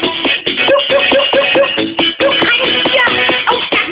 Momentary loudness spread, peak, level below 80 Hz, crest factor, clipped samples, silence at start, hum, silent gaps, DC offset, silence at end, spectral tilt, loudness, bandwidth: 3 LU; 0 dBFS; -48 dBFS; 12 dB; under 0.1%; 0 s; none; none; under 0.1%; 0 s; -5.5 dB/octave; -11 LUFS; 5.4 kHz